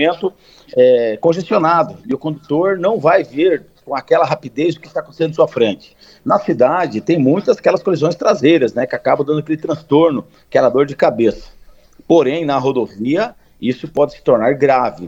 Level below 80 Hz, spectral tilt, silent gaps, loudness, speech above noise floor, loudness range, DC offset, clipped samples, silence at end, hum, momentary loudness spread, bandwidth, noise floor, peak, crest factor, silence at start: -52 dBFS; -7 dB/octave; none; -15 LUFS; 28 dB; 2 LU; under 0.1%; under 0.1%; 0 s; none; 9 LU; 7.8 kHz; -43 dBFS; 0 dBFS; 14 dB; 0 s